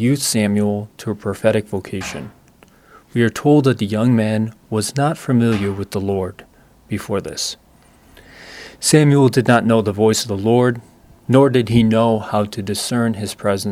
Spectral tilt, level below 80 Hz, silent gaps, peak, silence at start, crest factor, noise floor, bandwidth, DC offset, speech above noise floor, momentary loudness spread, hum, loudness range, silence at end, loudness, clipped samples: -5.5 dB/octave; -50 dBFS; none; 0 dBFS; 0 s; 18 dB; -49 dBFS; 16 kHz; under 0.1%; 33 dB; 14 LU; none; 6 LU; 0 s; -17 LUFS; under 0.1%